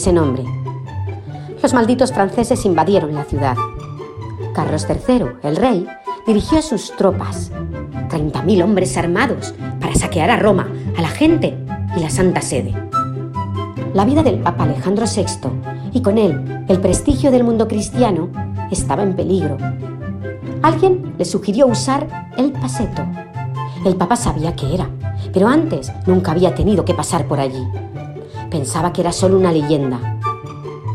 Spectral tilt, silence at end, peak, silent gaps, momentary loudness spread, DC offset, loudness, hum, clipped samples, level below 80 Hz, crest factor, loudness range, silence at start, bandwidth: -6 dB/octave; 0 s; 0 dBFS; none; 12 LU; 0.2%; -17 LUFS; none; under 0.1%; -36 dBFS; 16 dB; 2 LU; 0 s; 14 kHz